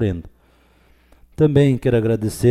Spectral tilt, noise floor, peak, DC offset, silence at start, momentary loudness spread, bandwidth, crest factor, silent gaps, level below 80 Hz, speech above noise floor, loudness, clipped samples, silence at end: -7.5 dB/octave; -55 dBFS; -4 dBFS; under 0.1%; 0 s; 8 LU; 14 kHz; 16 dB; none; -42 dBFS; 38 dB; -17 LUFS; under 0.1%; 0 s